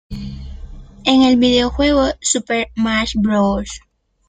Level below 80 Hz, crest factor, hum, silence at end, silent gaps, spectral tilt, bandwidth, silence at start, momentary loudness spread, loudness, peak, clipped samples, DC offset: -34 dBFS; 16 dB; none; 0.5 s; none; -4 dB/octave; 9.6 kHz; 0.1 s; 19 LU; -15 LUFS; 0 dBFS; under 0.1%; under 0.1%